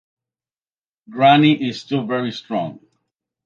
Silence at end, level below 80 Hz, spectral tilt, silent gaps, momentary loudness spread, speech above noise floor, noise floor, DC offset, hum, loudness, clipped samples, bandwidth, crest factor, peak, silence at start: 0.7 s; -68 dBFS; -7 dB/octave; none; 14 LU; over 73 dB; under -90 dBFS; under 0.1%; none; -18 LUFS; under 0.1%; 7.4 kHz; 18 dB; -2 dBFS; 1.1 s